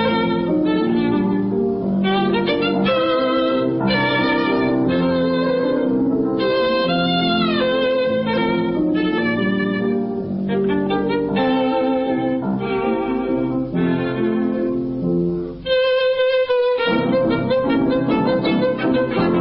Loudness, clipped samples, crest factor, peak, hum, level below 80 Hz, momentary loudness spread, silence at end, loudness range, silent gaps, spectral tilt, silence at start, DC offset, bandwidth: -19 LUFS; under 0.1%; 12 dB; -6 dBFS; none; -46 dBFS; 4 LU; 0 s; 2 LU; none; -11.5 dB/octave; 0 s; under 0.1%; 5.6 kHz